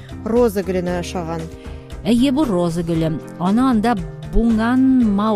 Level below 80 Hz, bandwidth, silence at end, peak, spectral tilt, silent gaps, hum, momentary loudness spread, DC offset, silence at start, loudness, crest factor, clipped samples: -32 dBFS; 14.5 kHz; 0 s; -4 dBFS; -7 dB/octave; none; none; 12 LU; under 0.1%; 0 s; -18 LUFS; 14 dB; under 0.1%